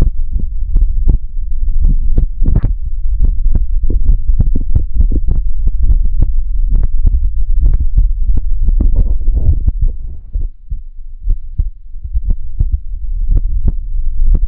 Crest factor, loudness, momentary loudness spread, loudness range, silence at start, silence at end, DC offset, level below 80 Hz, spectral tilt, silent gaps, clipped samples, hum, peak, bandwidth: 10 dB; -18 LUFS; 8 LU; 5 LU; 0 s; 0 s; under 0.1%; -10 dBFS; -13 dB/octave; none; under 0.1%; none; 0 dBFS; 0.9 kHz